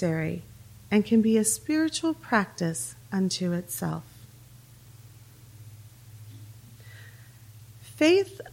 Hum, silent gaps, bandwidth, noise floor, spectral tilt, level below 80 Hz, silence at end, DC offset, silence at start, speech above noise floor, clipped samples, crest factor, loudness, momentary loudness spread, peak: none; none; 17 kHz; -51 dBFS; -4.5 dB/octave; -60 dBFS; 0 s; under 0.1%; 0 s; 25 dB; under 0.1%; 20 dB; -26 LUFS; 26 LU; -8 dBFS